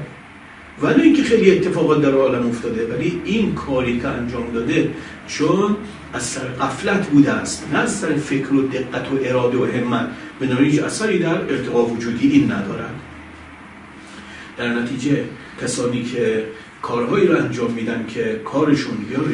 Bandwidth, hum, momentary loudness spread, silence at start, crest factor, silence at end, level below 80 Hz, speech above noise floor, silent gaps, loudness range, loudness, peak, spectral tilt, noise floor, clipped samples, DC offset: 11 kHz; none; 17 LU; 0 s; 20 dB; 0 s; -50 dBFS; 21 dB; none; 6 LU; -19 LUFS; 0 dBFS; -5.5 dB/octave; -40 dBFS; under 0.1%; under 0.1%